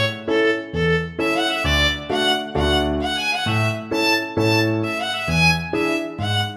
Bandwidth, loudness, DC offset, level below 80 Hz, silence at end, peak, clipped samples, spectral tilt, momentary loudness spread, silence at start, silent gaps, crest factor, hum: 16 kHz; -19 LUFS; under 0.1%; -34 dBFS; 0 s; -4 dBFS; under 0.1%; -4.5 dB/octave; 5 LU; 0 s; none; 16 dB; none